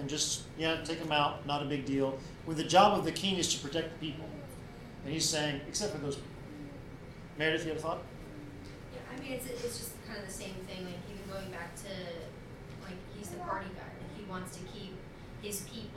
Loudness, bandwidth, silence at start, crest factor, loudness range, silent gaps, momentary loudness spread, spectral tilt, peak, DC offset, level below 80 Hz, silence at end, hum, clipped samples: -35 LUFS; 17.5 kHz; 0 s; 24 dB; 12 LU; none; 17 LU; -3.5 dB/octave; -12 dBFS; under 0.1%; -56 dBFS; 0 s; none; under 0.1%